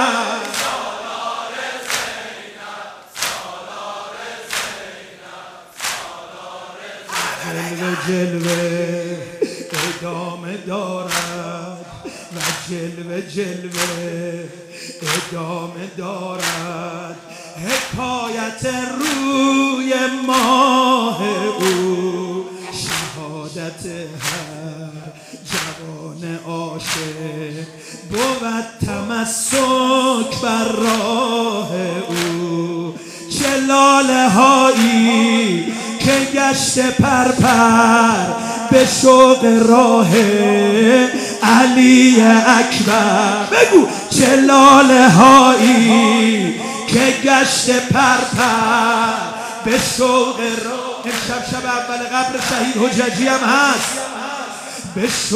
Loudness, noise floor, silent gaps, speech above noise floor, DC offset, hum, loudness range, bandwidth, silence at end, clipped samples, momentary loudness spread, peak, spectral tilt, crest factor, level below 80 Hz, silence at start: -14 LUFS; -37 dBFS; none; 23 dB; under 0.1%; none; 16 LU; 16 kHz; 0 s; under 0.1%; 19 LU; 0 dBFS; -4 dB/octave; 16 dB; -52 dBFS; 0 s